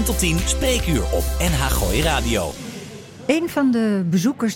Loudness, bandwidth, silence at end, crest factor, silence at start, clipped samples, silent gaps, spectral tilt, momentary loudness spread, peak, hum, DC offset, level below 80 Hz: -20 LUFS; 17 kHz; 0 s; 14 dB; 0 s; under 0.1%; none; -4.5 dB/octave; 11 LU; -6 dBFS; none; under 0.1%; -26 dBFS